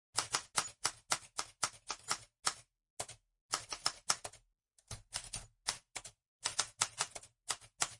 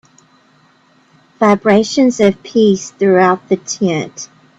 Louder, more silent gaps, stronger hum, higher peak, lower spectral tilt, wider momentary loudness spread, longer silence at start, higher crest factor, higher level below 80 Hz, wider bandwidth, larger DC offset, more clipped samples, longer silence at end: second, -39 LUFS vs -13 LUFS; first, 2.90-2.97 s, 3.41-3.49 s, 6.27-6.40 s vs none; neither; second, -12 dBFS vs 0 dBFS; second, 0.5 dB/octave vs -5.5 dB/octave; first, 14 LU vs 8 LU; second, 0.15 s vs 1.4 s; first, 30 dB vs 14 dB; second, -68 dBFS vs -58 dBFS; first, 11.5 kHz vs 8 kHz; neither; neither; second, 0 s vs 0.35 s